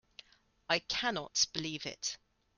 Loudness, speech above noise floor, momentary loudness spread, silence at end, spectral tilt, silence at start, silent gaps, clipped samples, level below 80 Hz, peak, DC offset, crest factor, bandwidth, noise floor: -34 LUFS; 24 dB; 10 LU; 0.4 s; -1.5 dB/octave; 0.7 s; none; under 0.1%; -68 dBFS; -14 dBFS; under 0.1%; 24 dB; 11.5 kHz; -59 dBFS